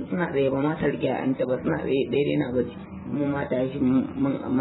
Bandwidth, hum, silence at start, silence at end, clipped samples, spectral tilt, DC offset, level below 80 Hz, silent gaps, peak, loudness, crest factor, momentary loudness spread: 4.1 kHz; none; 0 s; 0 s; under 0.1%; -11.5 dB/octave; under 0.1%; -54 dBFS; none; -12 dBFS; -25 LUFS; 14 dB; 5 LU